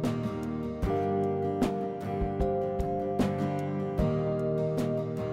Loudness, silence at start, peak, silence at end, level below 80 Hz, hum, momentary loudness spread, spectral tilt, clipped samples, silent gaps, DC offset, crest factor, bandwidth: -30 LUFS; 0 s; -14 dBFS; 0 s; -42 dBFS; none; 4 LU; -8.5 dB/octave; under 0.1%; none; under 0.1%; 16 dB; 15.5 kHz